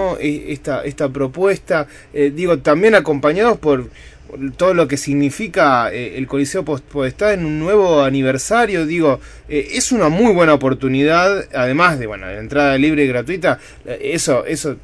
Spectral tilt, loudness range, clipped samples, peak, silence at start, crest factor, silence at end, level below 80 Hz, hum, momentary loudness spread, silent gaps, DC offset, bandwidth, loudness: -5 dB/octave; 2 LU; under 0.1%; 0 dBFS; 0 s; 16 dB; 0.05 s; -42 dBFS; none; 10 LU; none; under 0.1%; 11 kHz; -16 LUFS